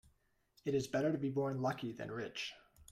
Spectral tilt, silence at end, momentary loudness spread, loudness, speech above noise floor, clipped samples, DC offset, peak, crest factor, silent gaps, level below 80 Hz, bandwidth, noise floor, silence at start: -6 dB/octave; 0.1 s; 10 LU; -39 LUFS; 37 dB; under 0.1%; under 0.1%; -24 dBFS; 16 dB; none; -70 dBFS; 15.5 kHz; -75 dBFS; 0.65 s